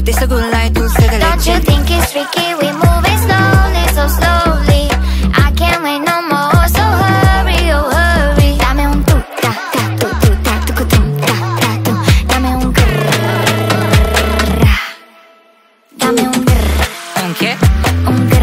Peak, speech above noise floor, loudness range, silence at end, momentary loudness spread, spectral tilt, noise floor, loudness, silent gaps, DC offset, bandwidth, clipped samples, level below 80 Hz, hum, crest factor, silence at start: 0 dBFS; 38 dB; 3 LU; 0 s; 4 LU; -5 dB/octave; -48 dBFS; -12 LUFS; none; under 0.1%; 16.5 kHz; under 0.1%; -16 dBFS; none; 10 dB; 0 s